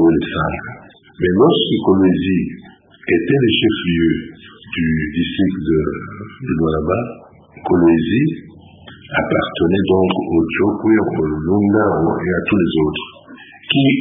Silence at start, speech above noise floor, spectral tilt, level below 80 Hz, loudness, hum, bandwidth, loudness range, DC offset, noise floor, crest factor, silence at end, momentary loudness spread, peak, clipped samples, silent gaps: 0 s; 24 dB; -12 dB/octave; -38 dBFS; -16 LUFS; none; 3.8 kHz; 3 LU; under 0.1%; -40 dBFS; 16 dB; 0 s; 14 LU; 0 dBFS; under 0.1%; none